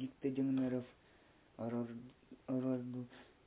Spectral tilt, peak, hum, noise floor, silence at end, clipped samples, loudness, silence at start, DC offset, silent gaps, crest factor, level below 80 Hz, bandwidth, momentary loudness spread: -8.5 dB/octave; -26 dBFS; none; -67 dBFS; 0.25 s; under 0.1%; -41 LUFS; 0 s; under 0.1%; none; 16 dB; -76 dBFS; 4 kHz; 18 LU